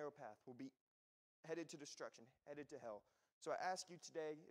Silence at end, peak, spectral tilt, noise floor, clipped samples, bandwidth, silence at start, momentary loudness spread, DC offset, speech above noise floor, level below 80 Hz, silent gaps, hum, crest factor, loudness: 0 s; -32 dBFS; -3.5 dB/octave; under -90 dBFS; under 0.1%; 15.5 kHz; 0 s; 12 LU; under 0.1%; over 38 dB; under -90 dBFS; 0.81-1.43 s, 3.33-3.41 s; none; 20 dB; -53 LUFS